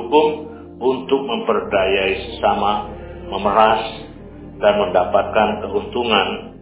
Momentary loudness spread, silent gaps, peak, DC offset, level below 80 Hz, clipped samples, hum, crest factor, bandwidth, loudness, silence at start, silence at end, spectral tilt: 16 LU; none; 0 dBFS; under 0.1%; -42 dBFS; under 0.1%; none; 18 dB; 4 kHz; -18 LUFS; 0 s; 0 s; -9 dB/octave